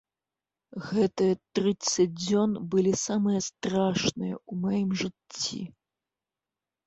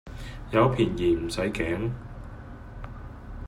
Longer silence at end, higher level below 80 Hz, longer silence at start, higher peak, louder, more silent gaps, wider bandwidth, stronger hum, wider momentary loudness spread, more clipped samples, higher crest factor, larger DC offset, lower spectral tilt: first, 1.2 s vs 0 s; second, -62 dBFS vs -42 dBFS; first, 0.75 s vs 0.05 s; second, -12 dBFS vs -8 dBFS; about the same, -28 LUFS vs -26 LUFS; neither; second, 8.2 kHz vs 12.5 kHz; neither; second, 9 LU vs 20 LU; neither; about the same, 16 dB vs 20 dB; neither; second, -5 dB/octave vs -6.5 dB/octave